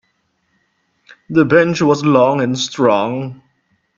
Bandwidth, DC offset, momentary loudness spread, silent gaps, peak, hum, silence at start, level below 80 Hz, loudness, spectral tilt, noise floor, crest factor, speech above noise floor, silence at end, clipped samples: 7.6 kHz; under 0.1%; 9 LU; none; 0 dBFS; none; 1.3 s; -56 dBFS; -14 LUFS; -5.5 dB/octave; -65 dBFS; 16 dB; 51 dB; 0.65 s; under 0.1%